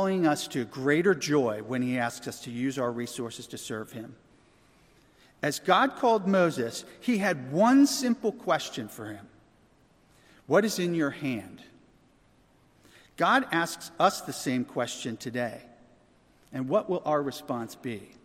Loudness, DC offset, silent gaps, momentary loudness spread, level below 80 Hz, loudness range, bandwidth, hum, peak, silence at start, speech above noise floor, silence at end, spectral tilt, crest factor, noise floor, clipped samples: -28 LUFS; under 0.1%; none; 14 LU; -70 dBFS; 7 LU; 16 kHz; none; -8 dBFS; 0 s; 35 dB; 0.2 s; -4.5 dB/octave; 22 dB; -63 dBFS; under 0.1%